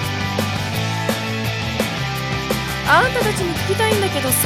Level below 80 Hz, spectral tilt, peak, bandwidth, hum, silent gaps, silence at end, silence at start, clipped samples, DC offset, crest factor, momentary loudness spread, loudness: -38 dBFS; -4 dB/octave; -2 dBFS; 17.5 kHz; none; none; 0 s; 0 s; under 0.1%; under 0.1%; 18 dB; 7 LU; -19 LUFS